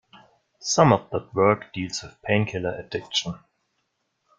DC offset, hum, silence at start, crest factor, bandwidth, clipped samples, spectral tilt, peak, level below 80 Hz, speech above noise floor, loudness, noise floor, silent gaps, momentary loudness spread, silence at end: under 0.1%; none; 0.6 s; 22 dB; 10 kHz; under 0.1%; -4.5 dB/octave; -2 dBFS; -58 dBFS; 51 dB; -24 LUFS; -75 dBFS; none; 14 LU; 1 s